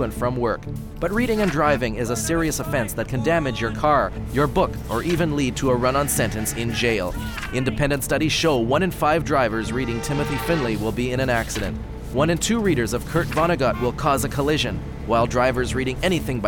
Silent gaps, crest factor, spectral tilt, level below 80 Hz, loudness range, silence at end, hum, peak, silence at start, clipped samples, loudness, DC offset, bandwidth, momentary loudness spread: none; 16 dB; -5 dB/octave; -34 dBFS; 1 LU; 0 s; none; -4 dBFS; 0 s; under 0.1%; -22 LUFS; under 0.1%; 19 kHz; 6 LU